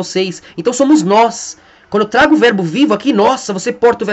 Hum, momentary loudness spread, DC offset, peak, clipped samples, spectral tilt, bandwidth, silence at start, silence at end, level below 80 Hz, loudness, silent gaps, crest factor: none; 10 LU; under 0.1%; 0 dBFS; under 0.1%; -4.5 dB/octave; 8.4 kHz; 0 s; 0 s; -50 dBFS; -12 LUFS; none; 12 dB